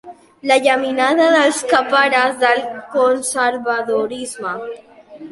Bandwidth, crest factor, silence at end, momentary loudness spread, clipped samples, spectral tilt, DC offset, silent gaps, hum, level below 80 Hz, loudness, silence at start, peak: 11.5 kHz; 16 dB; 0 s; 12 LU; under 0.1%; -2 dB/octave; under 0.1%; none; none; -64 dBFS; -16 LUFS; 0.05 s; -2 dBFS